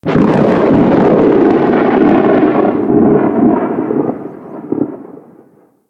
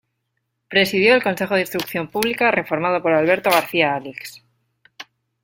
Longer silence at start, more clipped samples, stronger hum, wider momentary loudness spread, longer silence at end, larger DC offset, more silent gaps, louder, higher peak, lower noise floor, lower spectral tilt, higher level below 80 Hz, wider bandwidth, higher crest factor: second, 0.05 s vs 0.7 s; neither; neither; about the same, 12 LU vs 10 LU; first, 0.7 s vs 0.4 s; neither; neither; first, -11 LUFS vs -18 LUFS; about the same, 0 dBFS vs 0 dBFS; second, -46 dBFS vs -74 dBFS; first, -9.5 dB/octave vs -4.5 dB/octave; first, -42 dBFS vs -60 dBFS; second, 6.4 kHz vs 17 kHz; second, 10 dB vs 20 dB